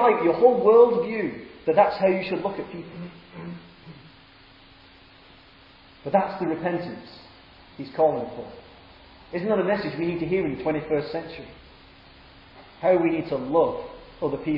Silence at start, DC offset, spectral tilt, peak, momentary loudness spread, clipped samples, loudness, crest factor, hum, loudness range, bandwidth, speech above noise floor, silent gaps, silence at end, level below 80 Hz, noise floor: 0 s; under 0.1%; -9.5 dB/octave; -4 dBFS; 21 LU; under 0.1%; -23 LUFS; 20 dB; none; 11 LU; 5.6 kHz; 28 dB; none; 0 s; -56 dBFS; -51 dBFS